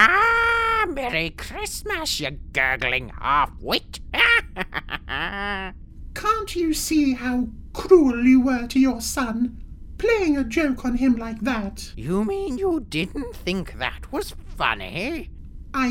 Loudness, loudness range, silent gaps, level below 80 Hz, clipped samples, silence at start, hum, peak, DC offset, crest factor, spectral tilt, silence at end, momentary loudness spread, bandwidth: -22 LUFS; 6 LU; none; -38 dBFS; under 0.1%; 0 s; none; -2 dBFS; under 0.1%; 22 dB; -4 dB/octave; 0 s; 14 LU; 17 kHz